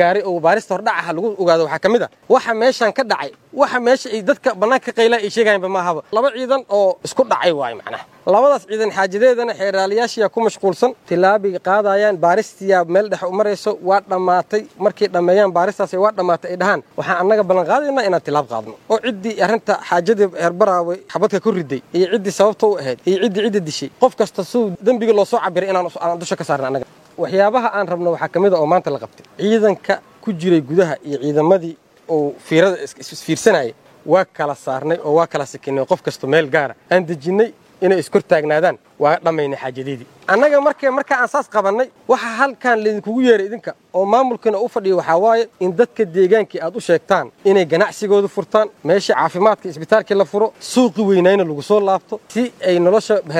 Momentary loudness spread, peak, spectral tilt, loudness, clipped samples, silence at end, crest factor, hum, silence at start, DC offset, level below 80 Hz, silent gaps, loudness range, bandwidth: 8 LU; 0 dBFS; -5.5 dB/octave; -17 LUFS; under 0.1%; 0 s; 16 dB; none; 0 s; under 0.1%; -66 dBFS; none; 2 LU; 14.5 kHz